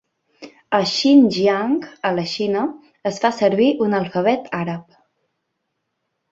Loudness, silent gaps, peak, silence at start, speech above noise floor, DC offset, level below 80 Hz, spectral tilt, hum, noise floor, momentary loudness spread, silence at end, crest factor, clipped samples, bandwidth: -19 LUFS; none; -2 dBFS; 0.4 s; 57 dB; under 0.1%; -64 dBFS; -5.5 dB/octave; none; -75 dBFS; 13 LU; 1.5 s; 18 dB; under 0.1%; 7.8 kHz